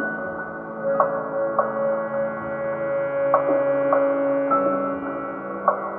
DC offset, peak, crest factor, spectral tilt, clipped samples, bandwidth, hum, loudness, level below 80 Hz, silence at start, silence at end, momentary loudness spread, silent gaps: under 0.1%; -4 dBFS; 20 dB; -10.5 dB/octave; under 0.1%; 3.2 kHz; none; -23 LUFS; -62 dBFS; 0 s; 0 s; 9 LU; none